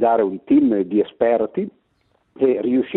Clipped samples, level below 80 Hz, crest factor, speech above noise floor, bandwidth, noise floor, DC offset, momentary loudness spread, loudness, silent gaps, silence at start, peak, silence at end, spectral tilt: under 0.1%; -60 dBFS; 16 dB; 46 dB; 4 kHz; -64 dBFS; under 0.1%; 8 LU; -19 LUFS; none; 0 s; -4 dBFS; 0 s; -11.5 dB/octave